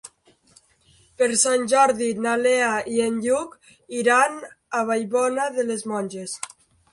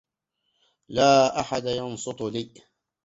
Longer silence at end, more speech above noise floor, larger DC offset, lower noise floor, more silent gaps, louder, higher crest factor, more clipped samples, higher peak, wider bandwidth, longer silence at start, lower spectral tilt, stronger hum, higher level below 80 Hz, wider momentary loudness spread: about the same, 0.45 s vs 0.55 s; second, 37 dB vs 55 dB; neither; second, -58 dBFS vs -79 dBFS; neither; about the same, -22 LUFS vs -24 LUFS; about the same, 18 dB vs 20 dB; neither; about the same, -6 dBFS vs -6 dBFS; first, 11.5 kHz vs 8 kHz; second, 0.05 s vs 0.9 s; second, -2.5 dB/octave vs -4 dB/octave; neither; second, -66 dBFS vs -60 dBFS; about the same, 14 LU vs 15 LU